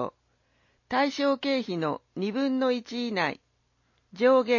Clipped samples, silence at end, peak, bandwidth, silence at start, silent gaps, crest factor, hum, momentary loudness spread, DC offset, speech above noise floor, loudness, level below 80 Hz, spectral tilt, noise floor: under 0.1%; 0 s; -10 dBFS; 7.4 kHz; 0 s; none; 18 dB; none; 8 LU; under 0.1%; 45 dB; -27 LUFS; -72 dBFS; -5.5 dB/octave; -71 dBFS